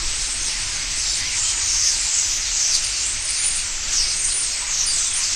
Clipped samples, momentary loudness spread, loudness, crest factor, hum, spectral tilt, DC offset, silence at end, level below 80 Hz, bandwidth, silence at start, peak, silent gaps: under 0.1%; 5 LU; -18 LUFS; 18 dB; none; 2 dB/octave; under 0.1%; 0 s; -38 dBFS; 16 kHz; 0 s; -4 dBFS; none